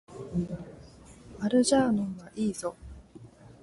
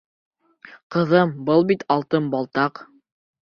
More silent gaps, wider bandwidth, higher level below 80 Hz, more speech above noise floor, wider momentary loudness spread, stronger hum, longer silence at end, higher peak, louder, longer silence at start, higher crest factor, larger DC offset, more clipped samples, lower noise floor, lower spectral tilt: second, none vs 0.83-0.90 s; first, 11.5 kHz vs 6.8 kHz; first, -54 dBFS vs -64 dBFS; second, 24 dB vs 28 dB; first, 25 LU vs 6 LU; neither; second, 0.1 s vs 0.6 s; second, -12 dBFS vs -2 dBFS; second, -29 LUFS vs -21 LUFS; second, 0.1 s vs 0.7 s; about the same, 18 dB vs 20 dB; neither; neither; about the same, -51 dBFS vs -48 dBFS; second, -5 dB/octave vs -8.5 dB/octave